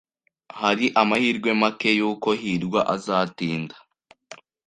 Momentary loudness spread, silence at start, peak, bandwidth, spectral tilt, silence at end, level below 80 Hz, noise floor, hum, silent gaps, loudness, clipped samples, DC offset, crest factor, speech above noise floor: 8 LU; 0.55 s; -2 dBFS; 11 kHz; -5 dB/octave; 0.3 s; -64 dBFS; -48 dBFS; none; none; -22 LUFS; under 0.1%; under 0.1%; 22 dB; 26 dB